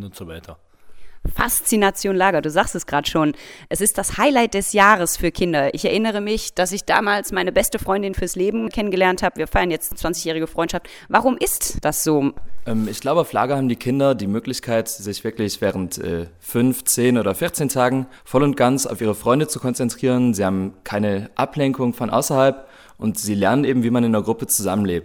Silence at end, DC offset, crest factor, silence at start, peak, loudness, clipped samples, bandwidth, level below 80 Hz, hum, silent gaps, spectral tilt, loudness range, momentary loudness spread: 0 s; under 0.1%; 20 dB; 0 s; 0 dBFS; -20 LUFS; under 0.1%; over 20 kHz; -40 dBFS; none; none; -4.5 dB/octave; 3 LU; 8 LU